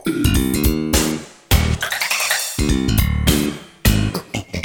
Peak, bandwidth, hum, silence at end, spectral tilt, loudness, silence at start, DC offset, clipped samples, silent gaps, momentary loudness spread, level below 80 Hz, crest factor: 0 dBFS; 19.5 kHz; none; 0 s; -4 dB/octave; -18 LUFS; 0.05 s; under 0.1%; under 0.1%; none; 6 LU; -24 dBFS; 18 dB